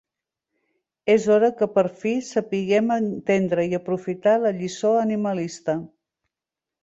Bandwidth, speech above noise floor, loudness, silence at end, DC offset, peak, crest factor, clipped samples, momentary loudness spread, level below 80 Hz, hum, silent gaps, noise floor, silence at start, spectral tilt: 8 kHz; 67 dB; -22 LUFS; 0.95 s; under 0.1%; -6 dBFS; 16 dB; under 0.1%; 8 LU; -66 dBFS; none; none; -88 dBFS; 1.05 s; -6 dB/octave